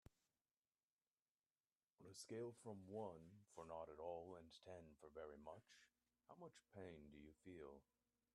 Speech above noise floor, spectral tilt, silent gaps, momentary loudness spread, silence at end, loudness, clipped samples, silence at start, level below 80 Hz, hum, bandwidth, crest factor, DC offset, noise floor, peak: over 32 dB; -5.5 dB/octave; none; 10 LU; 0.55 s; -59 LUFS; under 0.1%; 2 s; -84 dBFS; none; 11.5 kHz; 20 dB; under 0.1%; under -90 dBFS; -40 dBFS